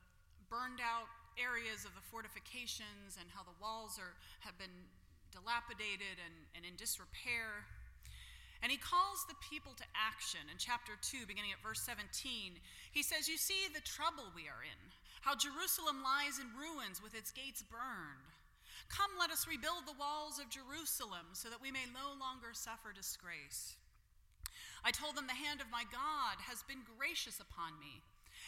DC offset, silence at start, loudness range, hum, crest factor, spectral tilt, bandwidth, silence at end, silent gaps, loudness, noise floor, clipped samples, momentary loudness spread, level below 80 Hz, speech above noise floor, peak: under 0.1%; 0.05 s; 6 LU; none; 26 dB; -0.5 dB/octave; 16.5 kHz; 0 s; none; -43 LUFS; -69 dBFS; under 0.1%; 16 LU; -66 dBFS; 25 dB; -20 dBFS